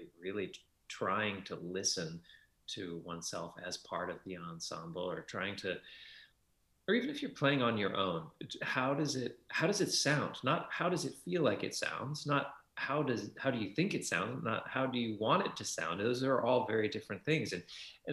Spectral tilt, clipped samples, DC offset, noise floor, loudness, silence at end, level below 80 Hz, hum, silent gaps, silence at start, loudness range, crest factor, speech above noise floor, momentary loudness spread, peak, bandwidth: -4 dB/octave; under 0.1%; under 0.1%; -75 dBFS; -36 LUFS; 0 s; -74 dBFS; none; none; 0 s; 8 LU; 20 dB; 39 dB; 13 LU; -16 dBFS; 13.5 kHz